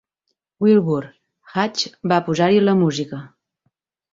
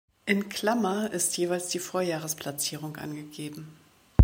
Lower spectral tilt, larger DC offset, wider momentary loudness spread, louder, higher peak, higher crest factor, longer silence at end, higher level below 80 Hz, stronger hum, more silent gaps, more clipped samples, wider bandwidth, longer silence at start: first, -6 dB/octave vs -4.5 dB/octave; neither; about the same, 12 LU vs 13 LU; first, -19 LUFS vs -30 LUFS; about the same, -4 dBFS vs -2 dBFS; second, 16 dB vs 26 dB; first, 0.85 s vs 0 s; second, -62 dBFS vs -42 dBFS; neither; neither; neither; second, 7.8 kHz vs 16.5 kHz; first, 0.6 s vs 0.25 s